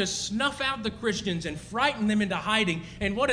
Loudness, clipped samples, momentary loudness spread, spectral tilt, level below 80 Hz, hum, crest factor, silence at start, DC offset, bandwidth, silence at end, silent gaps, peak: -27 LUFS; under 0.1%; 6 LU; -4 dB/octave; -50 dBFS; none; 18 dB; 0 s; under 0.1%; 10.5 kHz; 0 s; none; -10 dBFS